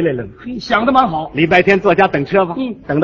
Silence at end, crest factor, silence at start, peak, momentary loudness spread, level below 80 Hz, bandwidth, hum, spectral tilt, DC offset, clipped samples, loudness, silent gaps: 0 s; 14 dB; 0 s; 0 dBFS; 13 LU; -44 dBFS; 7.4 kHz; none; -7 dB/octave; under 0.1%; under 0.1%; -14 LUFS; none